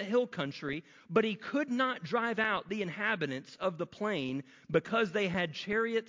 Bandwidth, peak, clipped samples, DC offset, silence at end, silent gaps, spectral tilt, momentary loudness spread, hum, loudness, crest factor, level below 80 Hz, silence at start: 7.6 kHz; -14 dBFS; under 0.1%; under 0.1%; 0.05 s; none; -6 dB/octave; 7 LU; none; -33 LUFS; 18 dB; -68 dBFS; 0 s